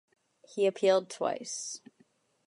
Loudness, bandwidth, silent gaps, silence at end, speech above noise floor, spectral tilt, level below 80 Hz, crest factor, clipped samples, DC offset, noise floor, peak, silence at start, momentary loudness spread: -30 LUFS; 11.5 kHz; none; 0.7 s; 38 dB; -3 dB/octave; -88 dBFS; 18 dB; under 0.1%; under 0.1%; -68 dBFS; -14 dBFS; 0.5 s; 15 LU